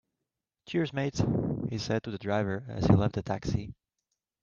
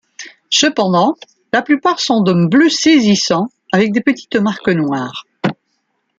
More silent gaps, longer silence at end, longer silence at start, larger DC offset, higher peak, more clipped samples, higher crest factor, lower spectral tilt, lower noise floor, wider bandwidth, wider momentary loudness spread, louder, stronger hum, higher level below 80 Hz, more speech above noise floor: neither; about the same, 0.7 s vs 0.65 s; first, 0.7 s vs 0.2 s; neither; second, -8 dBFS vs -2 dBFS; neither; first, 24 dB vs 14 dB; first, -7 dB/octave vs -4.5 dB/octave; first, -87 dBFS vs -67 dBFS; second, 7.2 kHz vs 9 kHz; about the same, 9 LU vs 11 LU; second, -30 LUFS vs -14 LUFS; neither; first, -50 dBFS vs -58 dBFS; first, 58 dB vs 54 dB